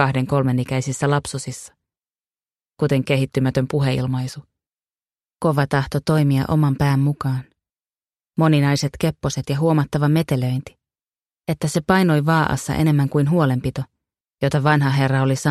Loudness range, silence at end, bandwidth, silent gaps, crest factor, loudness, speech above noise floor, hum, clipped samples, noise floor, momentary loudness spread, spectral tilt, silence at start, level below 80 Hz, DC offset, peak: 4 LU; 0 s; 13.5 kHz; none; 18 dB; -20 LUFS; over 71 dB; none; under 0.1%; under -90 dBFS; 11 LU; -6.5 dB/octave; 0 s; -46 dBFS; under 0.1%; -2 dBFS